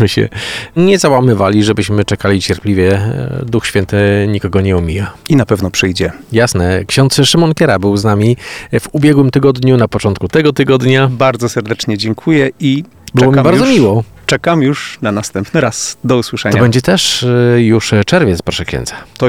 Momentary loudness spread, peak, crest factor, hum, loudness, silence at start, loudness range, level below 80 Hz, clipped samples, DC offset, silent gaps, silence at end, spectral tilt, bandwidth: 8 LU; 0 dBFS; 10 dB; none; -11 LUFS; 0 s; 2 LU; -36 dBFS; under 0.1%; under 0.1%; none; 0 s; -5.5 dB/octave; 16 kHz